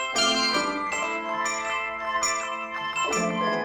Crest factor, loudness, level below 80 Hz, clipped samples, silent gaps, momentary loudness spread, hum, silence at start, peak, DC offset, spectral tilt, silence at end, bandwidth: 16 dB; -25 LUFS; -60 dBFS; under 0.1%; none; 7 LU; none; 0 s; -12 dBFS; under 0.1%; -1.5 dB/octave; 0 s; 17 kHz